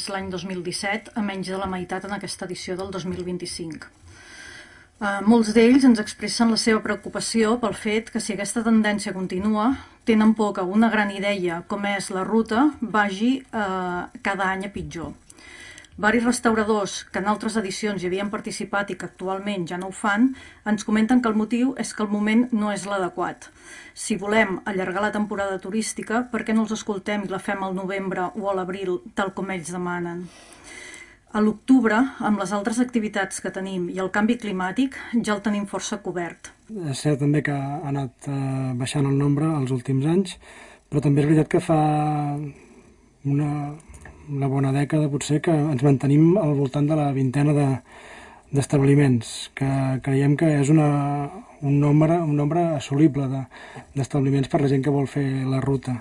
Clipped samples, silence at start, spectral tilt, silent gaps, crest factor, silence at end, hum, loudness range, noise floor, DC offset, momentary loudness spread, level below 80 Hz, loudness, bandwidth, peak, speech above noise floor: under 0.1%; 0 s; -6 dB/octave; none; 18 dB; 0 s; none; 6 LU; -52 dBFS; under 0.1%; 12 LU; -54 dBFS; -23 LUFS; 11.5 kHz; -4 dBFS; 30 dB